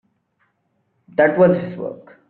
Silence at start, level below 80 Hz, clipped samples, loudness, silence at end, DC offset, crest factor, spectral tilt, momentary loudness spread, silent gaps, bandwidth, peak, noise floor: 1.2 s; -60 dBFS; under 0.1%; -17 LUFS; 0.35 s; under 0.1%; 18 dB; -7 dB/octave; 16 LU; none; 4.4 kHz; -2 dBFS; -68 dBFS